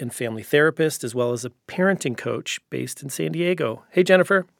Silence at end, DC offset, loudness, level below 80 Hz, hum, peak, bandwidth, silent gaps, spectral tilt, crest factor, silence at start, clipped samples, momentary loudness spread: 0.15 s; under 0.1%; -22 LUFS; -76 dBFS; none; 0 dBFS; 17.5 kHz; none; -5 dB/octave; 22 dB; 0 s; under 0.1%; 13 LU